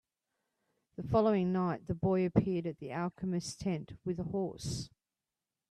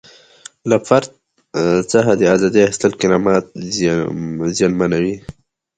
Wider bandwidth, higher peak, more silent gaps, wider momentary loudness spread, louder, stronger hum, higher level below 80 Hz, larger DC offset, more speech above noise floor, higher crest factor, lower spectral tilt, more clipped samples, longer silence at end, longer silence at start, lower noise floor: first, 12 kHz vs 9.6 kHz; second, -12 dBFS vs 0 dBFS; neither; about the same, 11 LU vs 10 LU; second, -34 LUFS vs -16 LUFS; neither; second, -60 dBFS vs -48 dBFS; neither; first, over 57 dB vs 27 dB; first, 22 dB vs 16 dB; first, -7 dB/octave vs -5.5 dB/octave; neither; first, 0.85 s vs 0.45 s; first, 1 s vs 0.65 s; first, under -90 dBFS vs -42 dBFS